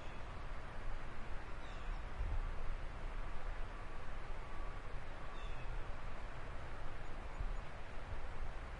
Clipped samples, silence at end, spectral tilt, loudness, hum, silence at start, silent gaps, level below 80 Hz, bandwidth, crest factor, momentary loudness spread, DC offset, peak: under 0.1%; 0 s; -6 dB/octave; -50 LUFS; none; 0 s; none; -44 dBFS; 7.8 kHz; 12 dB; 4 LU; under 0.1%; -28 dBFS